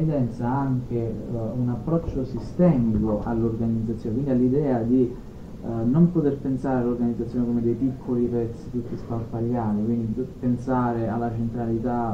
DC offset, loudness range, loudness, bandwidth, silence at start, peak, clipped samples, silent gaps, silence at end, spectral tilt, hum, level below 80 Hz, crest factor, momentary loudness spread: under 0.1%; 3 LU; -25 LUFS; 7.4 kHz; 0 s; -6 dBFS; under 0.1%; none; 0 s; -10.5 dB/octave; none; -42 dBFS; 18 dB; 9 LU